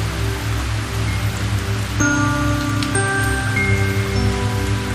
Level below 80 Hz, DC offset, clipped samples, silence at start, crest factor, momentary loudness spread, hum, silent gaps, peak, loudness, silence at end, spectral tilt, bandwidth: -28 dBFS; under 0.1%; under 0.1%; 0 s; 14 dB; 5 LU; none; none; -4 dBFS; -19 LUFS; 0 s; -5 dB/octave; 14.5 kHz